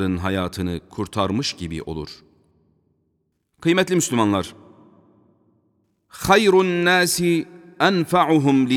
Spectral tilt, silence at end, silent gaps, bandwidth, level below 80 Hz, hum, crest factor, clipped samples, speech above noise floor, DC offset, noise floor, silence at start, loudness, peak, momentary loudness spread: -4.5 dB/octave; 0 s; none; 18 kHz; -50 dBFS; none; 20 dB; under 0.1%; 51 dB; under 0.1%; -71 dBFS; 0 s; -20 LUFS; -2 dBFS; 13 LU